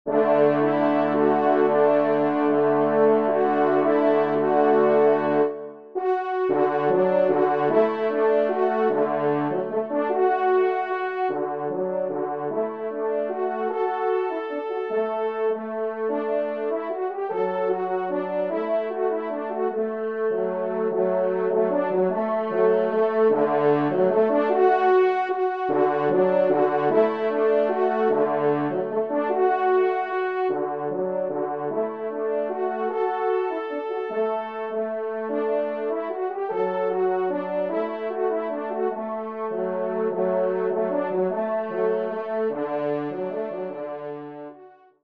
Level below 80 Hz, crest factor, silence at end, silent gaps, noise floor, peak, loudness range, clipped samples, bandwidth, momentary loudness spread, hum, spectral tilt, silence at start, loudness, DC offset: -76 dBFS; 16 dB; 0.35 s; none; -49 dBFS; -6 dBFS; 6 LU; under 0.1%; 5.2 kHz; 8 LU; none; -9 dB/octave; 0.05 s; -23 LUFS; 0.1%